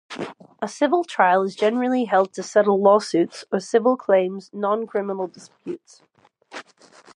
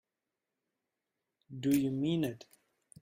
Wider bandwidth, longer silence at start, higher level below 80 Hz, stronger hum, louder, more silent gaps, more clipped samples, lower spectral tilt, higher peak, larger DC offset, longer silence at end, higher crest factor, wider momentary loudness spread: second, 11 kHz vs 16 kHz; second, 0.1 s vs 1.5 s; second, -78 dBFS vs -72 dBFS; neither; first, -21 LUFS vs -33 LUFS; neither; neither; second, -5 dB/octave vs -6.5 dB/octave; first, -4 dBFS vs -16 dBFS; neither; about the same, 0.55 s vs 0.6 s; about the same, 18 dB vs 20 dB; about the same, 18 LU vs 19 LU